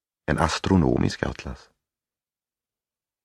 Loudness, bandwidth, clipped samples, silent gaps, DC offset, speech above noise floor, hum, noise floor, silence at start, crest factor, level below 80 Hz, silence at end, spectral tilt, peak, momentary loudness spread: -23 LUFS; 12 kHz; under 0.1%; none; under 0.1%; over 67 dB; none; under -90 dBFS; 0.3 s; 24 dB; -40 dBFS; 1.7 s; -6 dB/octave; -4 dBFS; 18 LU